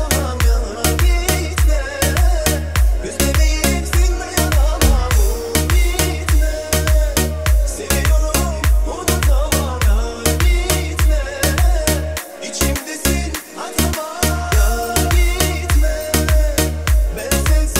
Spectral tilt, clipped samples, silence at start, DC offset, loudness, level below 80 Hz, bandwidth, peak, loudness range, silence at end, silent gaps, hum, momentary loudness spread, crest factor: -4 dB/octave; under 0.1%; 0 s; 0.6%; -17 LUFS; -18 dBFS; 16.5 kHz; 0 dBFS; 2 LU; 0 s; none; none; 3 LU; 16 dB